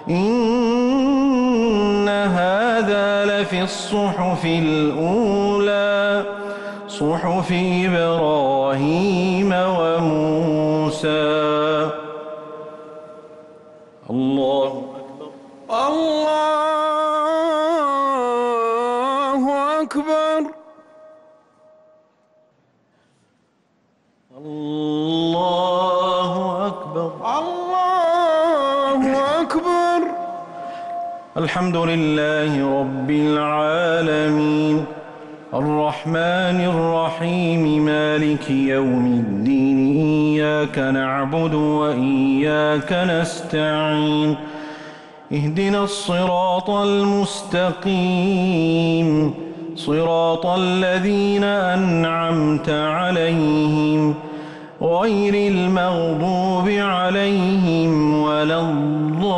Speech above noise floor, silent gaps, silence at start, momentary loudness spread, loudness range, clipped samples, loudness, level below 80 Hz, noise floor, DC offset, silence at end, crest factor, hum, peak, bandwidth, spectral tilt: 44 dB; none; 0 s; 10 LU; 5 LU; under 0.1%; -19 LUFS; -52 dBFS; -62 dBFS; under 0.1%; 0 s; 10 dB; none; -10 dBFS; 11.5 kHz; -6.5 dB/octave